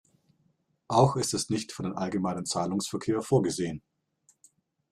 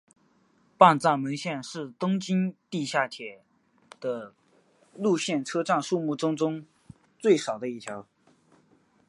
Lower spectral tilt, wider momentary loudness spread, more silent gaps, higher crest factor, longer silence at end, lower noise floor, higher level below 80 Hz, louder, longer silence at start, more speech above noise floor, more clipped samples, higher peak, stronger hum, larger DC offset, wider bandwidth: about the same, -5.5 dB/octave vs -5.5 dB/octave; second, 9 LU vs 18 LU; neither; about the same, 22 dB vs 26 dB; about the same, 1.15 s vs 1.05 s; first, -71 dBFS vs -65 dBFS; first, -62 dBFS vs -74 dBFS; about the same, -28 LUFS vs -27 LUFS; about the same, 0.9 s vs 0.8 s; first, 43 dB vs 39 dB; neither; second, -8 dBFS vs -2 dBFS; neither; neither; first, 15 kHz vs 11.5 kHz